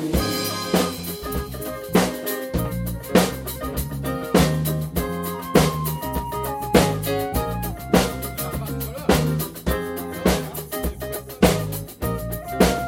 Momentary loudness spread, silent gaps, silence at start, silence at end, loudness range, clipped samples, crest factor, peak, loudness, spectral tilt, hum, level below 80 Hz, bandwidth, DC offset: 9 LU; none; 0 s; 0 s; 2 LU; under 0.1%; 22 dB; 0 dBFS; -23 LUFS; -5 dB/octave; none; -34 dBFS; 17 kHz; under 0.1%